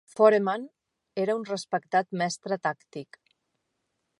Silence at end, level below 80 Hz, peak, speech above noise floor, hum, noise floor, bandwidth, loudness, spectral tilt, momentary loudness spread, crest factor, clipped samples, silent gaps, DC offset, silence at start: 1.15 s; -82 dBFS; -6 dBFS; 53 dB; none; -79 dBFS; 11.5 kHz; -27 LUFS; -5 dB/octave; 19 LU; 22 dB; under 0.1%; none; under 0.1%; 0.15 s